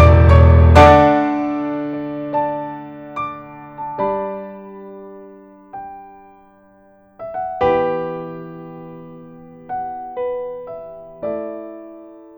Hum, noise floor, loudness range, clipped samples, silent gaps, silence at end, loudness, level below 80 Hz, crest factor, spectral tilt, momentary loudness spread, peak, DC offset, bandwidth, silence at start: none; -50 dBFS; 14 LU; under 0.1%; none; 0.3 s; -16 LUFS; -26 dBFS; 18 dB; -8.5 dB/octave; 26 LU; 0 dBFS; under 0.1%; 7.6 kHz; 0 s